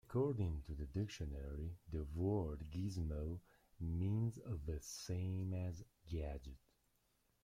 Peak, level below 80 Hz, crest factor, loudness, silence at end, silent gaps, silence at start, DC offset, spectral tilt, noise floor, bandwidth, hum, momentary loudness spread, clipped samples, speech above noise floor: -28 dBFS; -54 dBFS; 16 dB; -44 LUFS; 0.85 s; none; 0.1 s; under 0.1%; -7 dB/octave; -80 dBFS; 15.5 kHz; none; 9 LU; under 0.1%; 37 dB